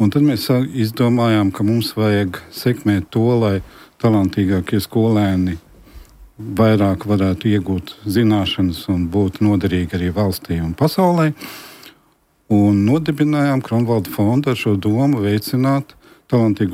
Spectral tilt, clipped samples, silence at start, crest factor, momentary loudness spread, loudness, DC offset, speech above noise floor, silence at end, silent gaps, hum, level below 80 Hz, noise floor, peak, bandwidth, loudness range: -7.5 dB/octave; under 0.1%; 0 s; 14 dB; 7 LU; -17 LUFS; under 0.1%; 42 dB; 0 s; none; none; -44 dBFS; -58 dBFS; -2 dBFS; 16 kHz; 2 LU